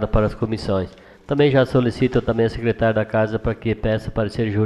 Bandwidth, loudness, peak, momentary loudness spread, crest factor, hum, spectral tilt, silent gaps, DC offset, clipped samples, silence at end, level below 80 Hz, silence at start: 11 kHz; -20 LUFS; -4 dBFS; 7 LU; 16 dB; none; -8 dB/octave; none; under 0.1%; under 0.1%; 0 s; -34 dBFS; 0 s